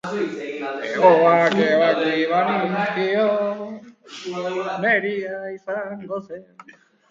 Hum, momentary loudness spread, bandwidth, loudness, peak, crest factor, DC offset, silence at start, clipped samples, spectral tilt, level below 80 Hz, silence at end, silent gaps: none; 16 LU; 7.6 kHz; -20 LUFS; 0 dBFS; 20 dB; under 0.1%; 0.05 s; under 0.1%; -6 dB/octave; -70 dBFS; 0.4 s; none